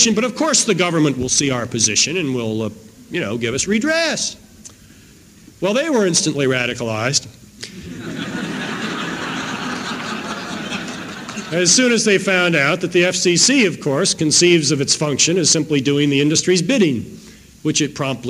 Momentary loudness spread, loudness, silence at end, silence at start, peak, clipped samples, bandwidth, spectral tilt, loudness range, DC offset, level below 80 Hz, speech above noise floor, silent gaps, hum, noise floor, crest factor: 13 LU; -17 LUFS; 0 s; 0 s; 0 dBFS; under 0.1%; 16 kHz; -3 dB/octave; 10 LU; under 0.1%; -54 dBFS; 28 dB; none; none; -45 dBFS; 18 dB